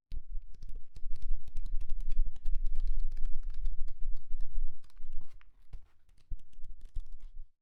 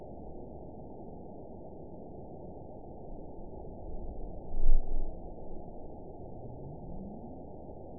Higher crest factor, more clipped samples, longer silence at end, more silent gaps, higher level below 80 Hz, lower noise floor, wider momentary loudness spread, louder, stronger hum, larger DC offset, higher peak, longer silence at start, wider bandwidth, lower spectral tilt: second, 12 dB vs 20 dB; neither; first, 0.2 s vs 0 s; neither; about the same, -32 dBFS vs -34 dBFS; first, -55 dBFS vs -47 dBFS; first, 16 LU vs 10 LU; about the same, -45 LUFS vs -44 LUFS; neither; second, under 0.1% vs 0.3%; second, -14 dBFS vs -10 dBFS; about the same, 0.1 s vs 0 s; second, 0.3 kHz vs 1 kHz; second, -7 dB/octave vs -14.5 dB/octave